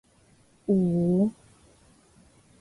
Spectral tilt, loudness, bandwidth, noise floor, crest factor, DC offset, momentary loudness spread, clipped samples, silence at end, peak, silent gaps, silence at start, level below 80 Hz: -10.5 dB/octave; -25 LUFS; 11 kHz; -60 dBFS; 16 dB; under 0.1%; 6 LU; under 0.1%; 1.3 s; -14 dBFS; none; 0.7 s; -60 dBFS